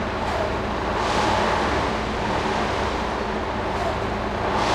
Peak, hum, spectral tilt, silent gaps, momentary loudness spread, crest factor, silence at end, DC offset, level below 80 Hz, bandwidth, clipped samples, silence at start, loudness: -8 dBFS; none; -5 dB/octave; none; 5 LU; 14 dB; 0 s; under 0.1%; -34 dBFS; 14 kHz; under 0.1%; 0 s; -24 LUFS